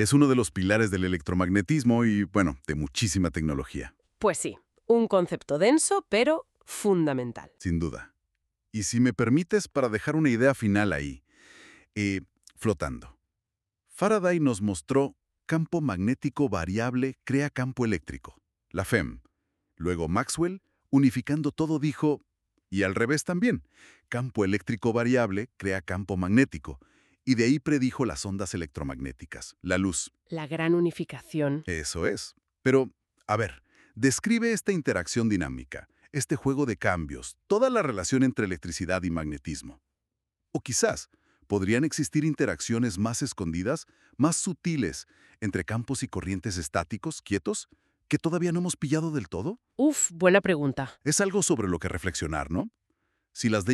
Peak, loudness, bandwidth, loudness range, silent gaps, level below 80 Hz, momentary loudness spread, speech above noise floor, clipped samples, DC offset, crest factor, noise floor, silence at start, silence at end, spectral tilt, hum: -6 dBFS; -27 LUFS; 13.5 kHz; 5 LU; none; -50 dBFS; 12 LU; 60 dB; under 0.1%; under 0.1%; 20 dB; -87 dBFS; 0 s; 0 s; -5 dB/octave; none